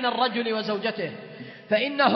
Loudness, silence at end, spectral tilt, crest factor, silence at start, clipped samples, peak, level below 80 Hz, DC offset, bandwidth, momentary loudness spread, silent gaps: -26 LUFS; 0 s; -6.5 dB/octave; 18 dB; 0 s; under 0.1%; -6 dBFS; -76 dBFS; under 0.1%; 6 kHz; 17 LU; none